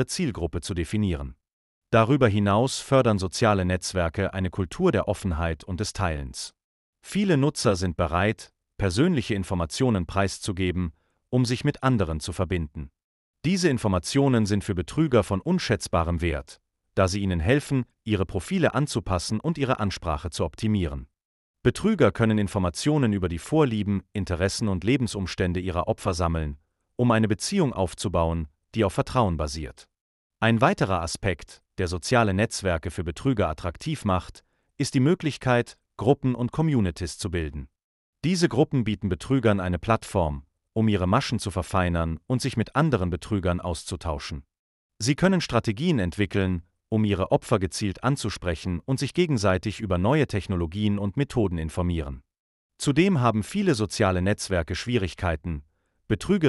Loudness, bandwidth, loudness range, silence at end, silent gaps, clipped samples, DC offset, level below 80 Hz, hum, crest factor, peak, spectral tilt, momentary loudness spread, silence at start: -25 LUFS; 11.5 kHz; 3 LU; 0 s; 1.53-1.82 s, 6.64-6.93 s, 13.04-13.34 s, 21.25-21.54 s, 30.01-30.30 s, 37.84-38.13 s, 44.59-44.90 s, 52.39-52.70 s; under 0.1%; under 0.1%; -42 dBFS; none; 18 dB; -6 dBFS; -6 dB/octave; 9 LU; 0 s